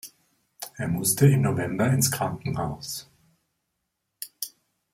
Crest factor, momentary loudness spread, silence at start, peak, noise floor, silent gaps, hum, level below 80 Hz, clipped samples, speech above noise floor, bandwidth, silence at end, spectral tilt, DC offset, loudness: 20 dB; 20 LU; 0.05 s; -6 dBFS; -80 dBFS; none; none; -58 dBFS; under 0.1%; 56 dB; 16.5 kHz; 0.45 s; -5 dB/octave; under 0.1%; -25 LUFS